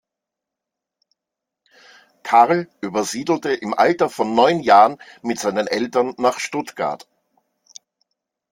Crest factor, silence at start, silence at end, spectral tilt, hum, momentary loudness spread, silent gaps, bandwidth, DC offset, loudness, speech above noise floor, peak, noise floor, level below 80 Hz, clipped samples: 20 dB; 2.25 s; 1.55 s; -4.5 dB/octave; none; 13 LU; none; 16.5 kHz; under 0.1%; -18 LUFS; 66 dB; -2 dBFS; -84 dBFS; -66 dBFS; under 0.1%